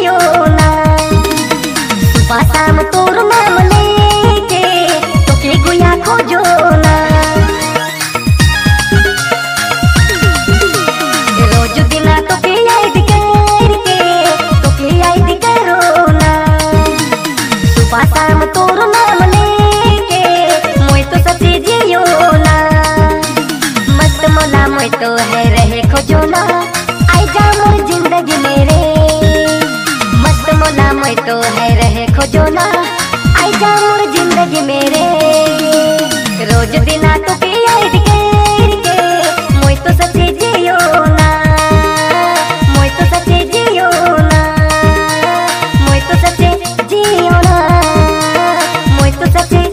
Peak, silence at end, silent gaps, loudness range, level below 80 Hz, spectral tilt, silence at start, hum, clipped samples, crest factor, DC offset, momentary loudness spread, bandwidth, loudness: 0 dBFS; 0 s; none; 1 LU; -18 dBFS; -5 dB/octave; 0 s; none; 1%; 8 dB; under 0.1%; 4 LU; 16.5 kHz; -9 LUFS